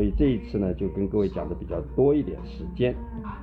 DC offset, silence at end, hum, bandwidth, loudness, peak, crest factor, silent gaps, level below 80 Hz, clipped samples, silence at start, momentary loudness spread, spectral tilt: under 0.1%; 0 s; none; 5.2 kHz; -27 LUFS; -10 dBFS; 16 dB; none; -36 dBFS; under 0.1%; 0 s; 13 LU; -10.5 dB/octave